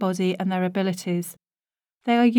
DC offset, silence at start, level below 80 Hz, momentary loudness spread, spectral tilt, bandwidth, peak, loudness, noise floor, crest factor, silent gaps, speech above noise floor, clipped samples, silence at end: under 0.1%; 0 s; -78 dBFS; 8 LU; -6 dB/octave; 18 kHz; -8 dBFS; -25 LUFS; under -90 dBFS; 16 dB; none; over 68 dB; under 0.1%; 0 s